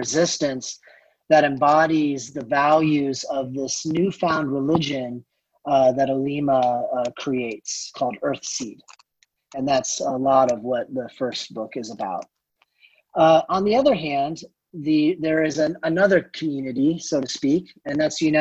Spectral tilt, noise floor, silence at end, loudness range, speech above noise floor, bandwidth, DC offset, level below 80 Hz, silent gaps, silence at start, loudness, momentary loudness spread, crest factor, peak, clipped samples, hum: -4.5 dB/octave; -67 dBFS; 0 s; 4 LU; 46 dB; 8.4 kHz; under 0.1%; -60 dBFS; none; 0 s; -22 LUFS; 12 LU; 18 dB; -4 dBFS; under 0.1%; none